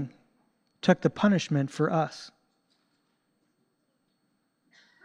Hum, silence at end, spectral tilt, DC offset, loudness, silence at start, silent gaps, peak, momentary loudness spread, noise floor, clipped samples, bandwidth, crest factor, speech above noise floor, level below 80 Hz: none; 2.75 s; -6.5 dB/octave; under 0.1%; -27 LUFS; 0 s; none; -8 dBFS; 12 LU; -75 dBFS; under 0.1%; 10 kHz; 22 dB; 49 dB; -72 dBFS